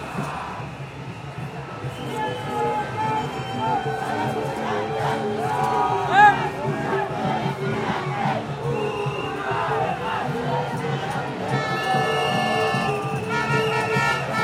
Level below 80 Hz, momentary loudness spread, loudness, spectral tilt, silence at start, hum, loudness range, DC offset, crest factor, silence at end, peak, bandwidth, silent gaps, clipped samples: -54 dBFS; 10 LU; -23 LUFS; -5.5 dB/octave; 0 s; none; 6 LU; under 0.1%; 20 dB; 0 s; -2 dBFS; 16.5 kHz; none; under 0.1%